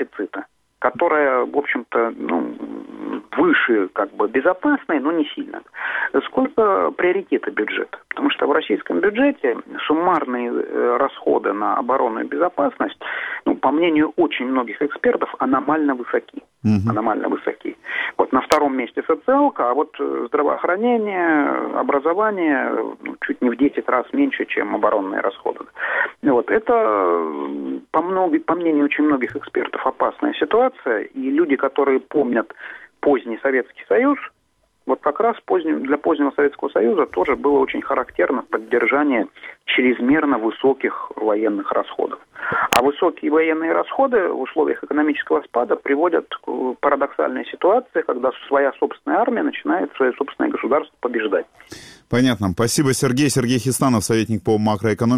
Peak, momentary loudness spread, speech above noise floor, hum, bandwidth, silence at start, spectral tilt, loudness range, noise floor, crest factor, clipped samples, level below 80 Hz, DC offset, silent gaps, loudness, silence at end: 0 dBFS; 8 LU; 45 dB; none; 19 kHz; 0 s; -5.5 dB/octave; 2 LU; -64 dBFS; 20 dB; under 0.1%; -58 dBFS; under 0.1%; none; -20 LUFS; 0 s